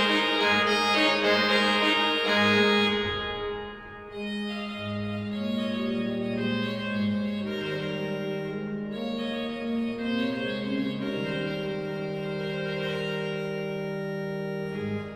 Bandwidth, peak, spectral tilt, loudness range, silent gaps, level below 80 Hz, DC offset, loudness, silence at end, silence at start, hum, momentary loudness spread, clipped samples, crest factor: 16 kHz; -10 dBFS; -5 dB/octave; 9 LU; none; -56 dBFS; under 0.1%; -27 LUFS; 0 s; 0 s; none; 11 LU; under 0.1%; 18 dB